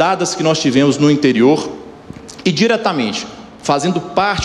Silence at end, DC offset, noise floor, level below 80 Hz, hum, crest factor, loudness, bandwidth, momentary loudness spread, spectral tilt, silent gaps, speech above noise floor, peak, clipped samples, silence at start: 0 s; under 0.1%; -34 dBFS; -52 dBFS; none; 14 dB; -15 LUFS; 11.5 kHz; 19 LU; -5 dB/octave; none; 20 dB; 0 dBFS; under 0.1%; 0 s